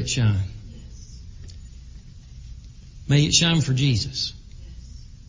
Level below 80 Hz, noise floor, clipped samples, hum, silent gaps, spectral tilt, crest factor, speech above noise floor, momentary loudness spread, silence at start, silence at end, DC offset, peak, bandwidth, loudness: -40 dBFS; -42 dBFS; under 0.1%; none; none; -4 dB/octave; 20 dB; 22 dB; 26 LU; 0 s; 0.05 s; under 0.1%; -6 dBFS; 7.6 kHz; -21 LUFS